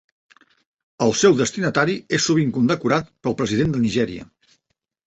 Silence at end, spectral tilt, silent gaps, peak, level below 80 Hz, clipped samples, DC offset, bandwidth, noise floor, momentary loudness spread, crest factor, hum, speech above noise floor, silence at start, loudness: 0.85 s; -5 dB/octave; none; -2 dBFS; -52 dBFS; under 0.1%; under 0.1%; 8.2 kHz; -75 dBFS; 7 LU; 18 dB; none; 56 dB; 1 s; -20 LUFS